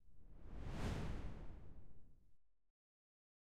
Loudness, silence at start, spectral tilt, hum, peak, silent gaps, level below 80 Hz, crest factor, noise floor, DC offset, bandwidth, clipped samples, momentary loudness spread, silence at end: -51 LUFS; 0 s; -6.5 dB/octave; none; -32 dBFS; none; -54 dBFS; 18 dB; -69 dBFS; under 0.1%; 13 kHz; under 0.1%; 20 LU; 0.7 s